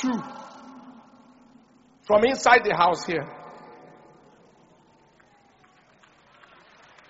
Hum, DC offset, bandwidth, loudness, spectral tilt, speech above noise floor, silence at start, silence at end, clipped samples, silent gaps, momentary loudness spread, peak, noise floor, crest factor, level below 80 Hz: none; under 0.1%; 7.6 kHz; -21 LUFS; -2 dB/octave; 37 dB; 0 s; 3.6 s; under 0.1%; none; 28 LU; -2 dBFS; -58 dBFS; 26 dB; -64 dBFS